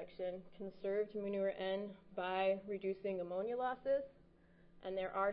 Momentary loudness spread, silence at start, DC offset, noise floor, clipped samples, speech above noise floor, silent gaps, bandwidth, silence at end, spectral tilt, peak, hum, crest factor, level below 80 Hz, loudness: 9 LU; 0 s; under 0.1%; -66 dBFS; under 0.1%; 26 dB; none; 5.2 kHz; 0 s; -4 dB/octave; -24 dBFS; none; 16 dB; -72 dBFS; -41 LUFS